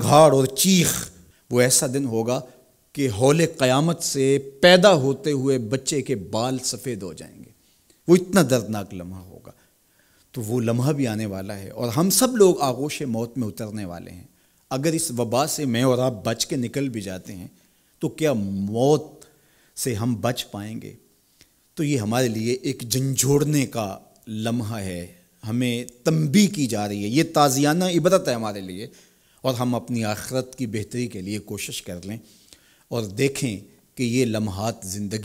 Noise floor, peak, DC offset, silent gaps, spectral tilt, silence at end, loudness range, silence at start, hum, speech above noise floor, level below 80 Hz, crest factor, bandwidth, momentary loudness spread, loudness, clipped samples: -61 dBFS; -2 dBFS; under 0.1%; none; -4.5 dB/octave; 0 s; 8 LU; 0 s; none; 39 dB; -58 dBFS; 22 dB; 16 kHz; 18 LU; -22 LUFS; under 0.1%